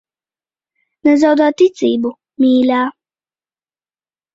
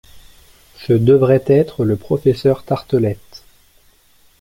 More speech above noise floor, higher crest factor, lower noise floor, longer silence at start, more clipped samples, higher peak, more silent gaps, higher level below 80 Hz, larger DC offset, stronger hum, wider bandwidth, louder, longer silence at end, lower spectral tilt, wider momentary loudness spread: first, over 78 dB vs 38 dB; about the same, 14 dB vs 16 dB; first, under -90 dBFS vs -52 dBFS; first, 1.05 s vs 0.15 s; neither; about the same, -2 dBFS vs -2 dBFS; neither; second, -62 dBFS vs -48 dBFS; neither; neither; second, 7.8 kHz vs 15.5 kHz; about the same, -14 LUFS vs -15 LUFS; first, 1.45 s vs 1.05 s; second, -5 dB/octave vs -9 dB/octave; about the same, 8 LU vs 9 LU